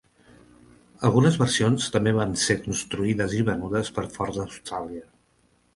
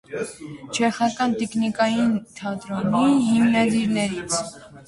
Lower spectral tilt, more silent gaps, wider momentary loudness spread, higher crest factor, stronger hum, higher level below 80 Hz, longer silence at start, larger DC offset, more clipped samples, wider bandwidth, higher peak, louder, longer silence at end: about the same, -5 dB/octave vs -4.5 dB/octave; neither; about the same, 13 LU vs 13 LU; about the same, 18 dB vs 16 dB; neither; first, -50 dBFS vs -58 dBFS; first, 1 s vs 0.1 s; neither; neither; about the same, 11.5 kHz vs 11.5 kHz; about the same, -6 dBFS vs -6 dBFS; about the same, -24 LUFS vs -22 LUFS; first, 0.7 s vs 0.05 s